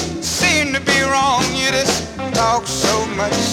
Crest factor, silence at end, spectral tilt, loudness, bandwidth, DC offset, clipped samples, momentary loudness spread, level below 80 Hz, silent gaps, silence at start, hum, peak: 16 dB; 0 s; -2.5 dB/octave; -16 LUFS; 18 kHz; under 0.1%; under 0.1%; 5 LU; -40 dBFS; none; 0 s; none; 0 dBFS